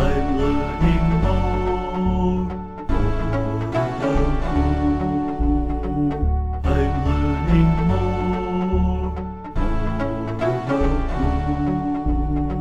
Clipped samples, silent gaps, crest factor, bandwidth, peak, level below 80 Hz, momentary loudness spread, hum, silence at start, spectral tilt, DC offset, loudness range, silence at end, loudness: under 0.1%; none; 14 dB; 8.4 kHz; -6 dBFS; -24 dBFS; 6 LU; none; 0 s; -8.5 dB/octave; 1%; 2 LU; 0 s; -22 LUFS